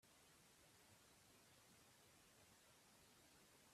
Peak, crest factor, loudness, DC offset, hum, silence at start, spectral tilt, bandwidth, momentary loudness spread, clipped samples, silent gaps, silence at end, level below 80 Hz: -58 dBFS; 14 dB; -70 LUFS; under 0.1%; none; 0 s; -2.5 dB/octave; 14.5 kHz; 0 LU; under 0.1%; none; 0 s; -90 dBFS